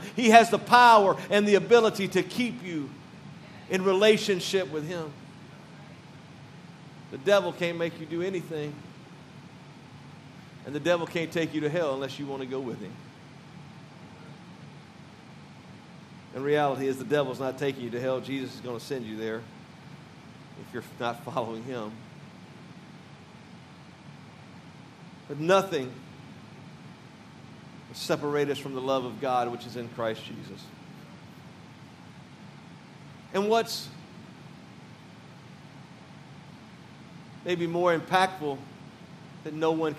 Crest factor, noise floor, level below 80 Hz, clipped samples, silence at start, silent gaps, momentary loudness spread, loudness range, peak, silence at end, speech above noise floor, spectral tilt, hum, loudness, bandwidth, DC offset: 28 dB; -49 dBFS; -76 dBFS; under 0.1%; 0 s; none; 25 LU; 14 LU; -2 dBFS; 0 s; 23 dB; -5 dB/octave; none; -26 LUFS; 14.5 kHz; under 0.1%